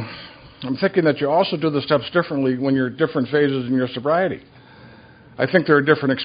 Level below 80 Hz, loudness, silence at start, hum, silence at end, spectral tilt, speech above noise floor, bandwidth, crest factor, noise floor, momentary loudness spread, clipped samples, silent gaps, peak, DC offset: -58 dBFS; -19 LUFS; 0 s; none; 0 s; -10.5 dB/octave; 27 dB; 5.2 kHz; 20 dB; -46 dBFS; 12 LU; under 0.1%; none; 0 dBFS; under 0.1%